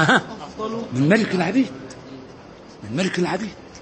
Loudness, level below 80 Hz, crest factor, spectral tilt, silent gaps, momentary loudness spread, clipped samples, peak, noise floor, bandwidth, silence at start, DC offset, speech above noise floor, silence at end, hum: -21 LUFS; -56 dBFS; 22 dB; -5.5 dB/octave; none; 22 LU; under 0.1%; -2 dBFS; -42 dBFS; 8.8 kHz; 0 s; under 0.1%; 21 dB; 0 s; none